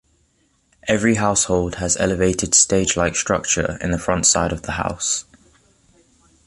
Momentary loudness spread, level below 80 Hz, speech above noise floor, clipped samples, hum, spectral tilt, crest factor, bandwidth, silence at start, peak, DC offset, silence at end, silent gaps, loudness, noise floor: 9 LU; -38 dBFS; 44 dB; under 0.1%; none; -3 dB/octave; 20 dB; 11.5 kHz; 0.85 s; 0 dBFS; under 0.1%; 1.25 s; none; -18 LUFS; -63 dBFS